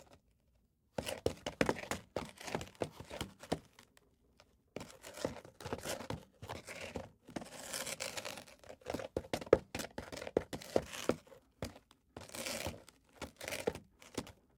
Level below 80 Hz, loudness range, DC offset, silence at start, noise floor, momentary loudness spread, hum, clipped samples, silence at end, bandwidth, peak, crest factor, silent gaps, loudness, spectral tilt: -62 dBFS; 8 LU; under 0.1%; 0 s; -74 dBFS; 14 LU; none; under 0.1%; 0.25 s; 17.5 kHz; -10 dBFS; 34 dB; none; -42 LUFS; -4 dB/octave